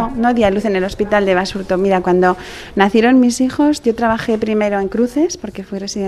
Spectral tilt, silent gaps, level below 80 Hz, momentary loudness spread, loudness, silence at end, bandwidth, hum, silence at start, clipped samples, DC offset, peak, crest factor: -5.5 dB/octave; none; -40 dBFS; 9 LU; -15 LUFS; 0 s; 13 kHz; none; 0 s; under 0.1%; under 0.1%; 0 dBFS; 14 dB